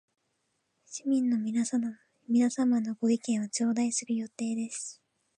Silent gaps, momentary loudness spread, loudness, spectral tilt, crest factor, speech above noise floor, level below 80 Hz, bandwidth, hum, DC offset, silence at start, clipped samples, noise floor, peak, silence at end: none; 11 LU; -30 LUFS; -4 dB/octave; 14 dB; 49 dB; -84 dBFS; 10.5 kHz; none; under 0.1%; 0.9 s; under 0.1%; -78 dBFS; -16 dBFS; 0.45 s